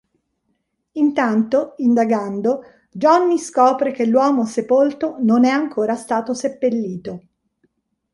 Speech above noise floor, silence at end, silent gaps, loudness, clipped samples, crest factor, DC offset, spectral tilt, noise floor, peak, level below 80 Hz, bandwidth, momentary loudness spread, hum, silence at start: 53 dB; 0.95 s; none; -18 LUFS; under 0.1%; 16 dB; under 0.1%; -6 dB/octave; -70 dBFS; -2 dBFS; -64 dBFS; 11.5 kHz; 10 LU; none; 0.95 s